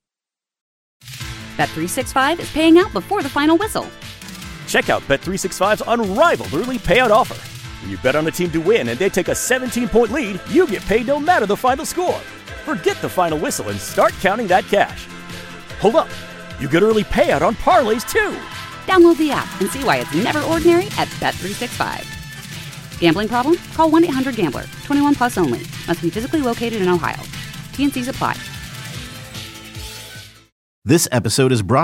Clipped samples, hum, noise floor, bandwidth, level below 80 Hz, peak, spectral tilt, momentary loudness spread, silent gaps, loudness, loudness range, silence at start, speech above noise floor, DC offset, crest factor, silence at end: under 0.1%; none; -89 dBFS; 16.5 kHz; -40 dBFS; -2 dBFS; -4.5 dB/octave; 17 LU; 30.52-30.82 s; -17 LUFS; 5 LU; 1.05 s; 72 dB; under 0.1%; 16 dB; 0 s